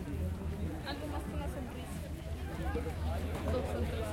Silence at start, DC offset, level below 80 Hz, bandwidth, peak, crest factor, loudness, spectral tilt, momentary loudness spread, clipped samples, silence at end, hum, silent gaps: 0 s; under 0.1%; -44 dBFS; 16.5 kHz; -22 dBFS; 14 dB; -39 LUFS; -6.5 dB/octave; 6 LU; under 0.1%; 0 s; none; none